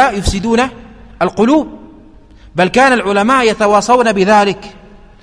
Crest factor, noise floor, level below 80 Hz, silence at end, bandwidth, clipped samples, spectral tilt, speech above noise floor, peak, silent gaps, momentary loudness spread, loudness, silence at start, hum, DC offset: 12 dB; -39 dBFS; -32 dBFS; 0.5 s; 11 kHz; under 0.1%; -5 dB/octave; 28 dB; 0 dBFS; none; 9 LU; -12 LUFS; 0 s; none; under 0.1%